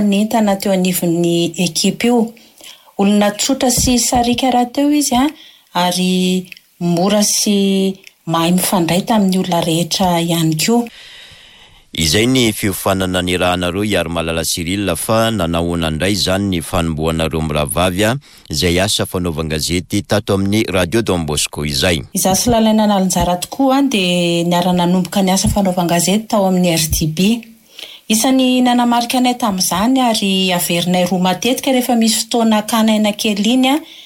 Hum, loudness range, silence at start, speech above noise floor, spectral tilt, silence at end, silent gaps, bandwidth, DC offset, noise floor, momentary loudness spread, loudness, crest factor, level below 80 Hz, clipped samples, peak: none; 2 LU; 0 s; 29 dB; -4 dB/octave; 0 s; none; 17 kHz; under 0.1%; -43 dBFS; 5 LU; -15 LUFS; 12 dB; -36 dBFS; under 0.1%; -4 dBFS